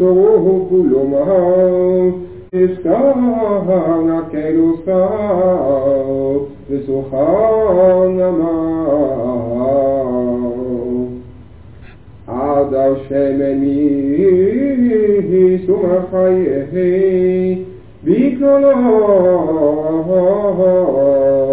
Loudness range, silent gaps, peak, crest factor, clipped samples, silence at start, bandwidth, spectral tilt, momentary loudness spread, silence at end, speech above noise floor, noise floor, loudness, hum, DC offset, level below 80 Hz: 5 LU; none; -2 dBFS; 12 dB; under 0.1%; 0 s; 4 kHz; -12.5 dB/octave; 8 LU; 0 s; 25 dB; -37 dBFS; -14 LUFS; none; 0.6%; -44 dBFS